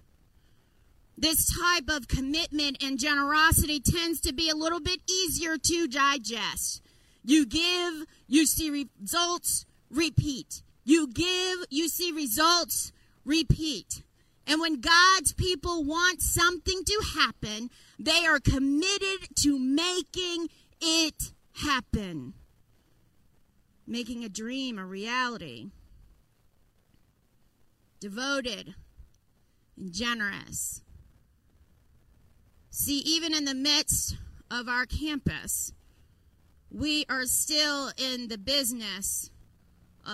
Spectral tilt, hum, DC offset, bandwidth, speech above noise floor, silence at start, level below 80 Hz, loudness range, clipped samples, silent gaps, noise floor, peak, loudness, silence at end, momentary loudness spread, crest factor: -2.5 dB/octave; none; under 0.1%; 16 kHz; 38 dB; 1.15 s; -44 dBFS; 11 LU; under 0.1%; none; -66 dBFS; -8 dBFS; -27 LUFS; 0 s; 14 LU; 20 dB